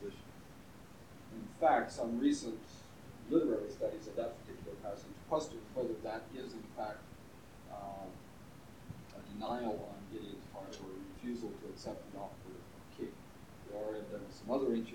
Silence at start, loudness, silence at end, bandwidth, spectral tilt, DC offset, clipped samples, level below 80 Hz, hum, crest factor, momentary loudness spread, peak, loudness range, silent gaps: 0 s; -40 LUFS; 0 s; 19 kHz; -5.5 dB/octave; under 0.1%; under 0.1%; -66 dBFS; none; 22 dB; 21 LU; -18 dBFS; 11 LU; none